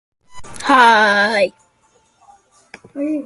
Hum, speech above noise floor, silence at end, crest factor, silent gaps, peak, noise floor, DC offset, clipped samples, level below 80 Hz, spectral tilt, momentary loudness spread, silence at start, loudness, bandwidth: none; 44 dB; 0 s; 18 dB; none; 0 dBFS; -58 dBFS; under 0.1%; under 0.1%; -56 dBFS; -3 dB/octave; 16 LU; 0.35 s; -13 LUFS; 11.5 kHz